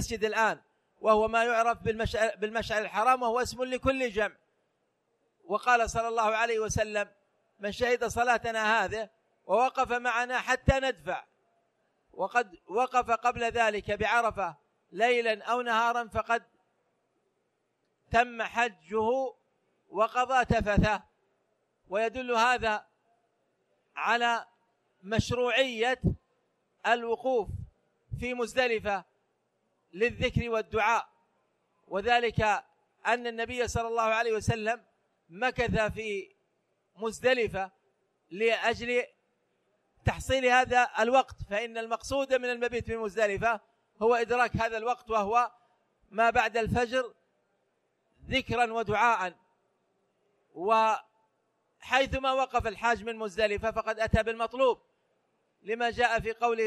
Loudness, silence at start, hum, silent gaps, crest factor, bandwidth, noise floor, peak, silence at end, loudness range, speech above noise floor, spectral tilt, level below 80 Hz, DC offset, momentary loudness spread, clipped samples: -29 LUFS; 0 s; none; none; 22 dB; 13.5 kHz; -77 dBFS; -8 dBFS; 0 s; 4 LU; 49 dB; -4.5 dB/octave; -48 dBFS; under 0.1%; 10 LU; under 0.1%